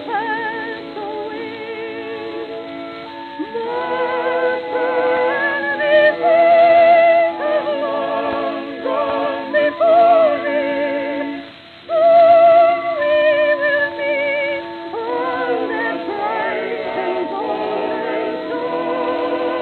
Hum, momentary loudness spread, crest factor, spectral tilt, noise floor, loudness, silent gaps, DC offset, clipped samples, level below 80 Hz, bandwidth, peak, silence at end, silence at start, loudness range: none; 16 LU; 14 dB; -6.5 dB/octave; -37 dBFS; -17 LUFS; none; under 0.1%; under 0.1%; -64 dBFS; 4.5 kHz; -2 dBFS; 0 s; 0 s; 9 LU